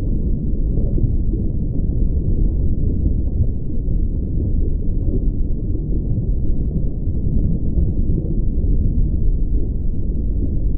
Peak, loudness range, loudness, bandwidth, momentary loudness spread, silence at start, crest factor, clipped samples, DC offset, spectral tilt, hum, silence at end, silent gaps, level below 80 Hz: -4 dBFS; 1 LU; -22 LUFS; 0.9 kHz; 3 LU; 0 s; 12 dB; under 0.1%; under 0.1%; -19.5 dB/octave; none; 0 s; none; -18 dBFS